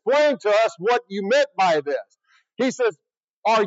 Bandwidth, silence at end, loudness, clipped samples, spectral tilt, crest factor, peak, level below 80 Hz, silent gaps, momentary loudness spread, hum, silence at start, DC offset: 8 kHz; 0 s; -21 LUFS; under 0.1%; -4 dB/octave; 14 dB; -8 dBFS; under -90 dBFS; 3.17-3.21 s, 3.29-3.43 s; 7 LU; none; 0.05 s; under 0.1%